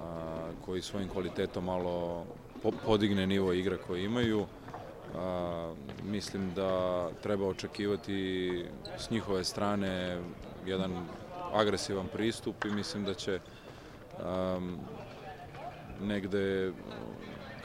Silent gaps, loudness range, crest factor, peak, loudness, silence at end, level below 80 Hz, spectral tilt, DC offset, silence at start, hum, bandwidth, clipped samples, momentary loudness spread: none; 5 LU; 22 dB; -12 dBFS; -35 LUFS; 0 s; -56 dBFS; -5.5 dB/octave; under 0.1%; 0 s; none; 16 kHz; under 0.1%; 15 LU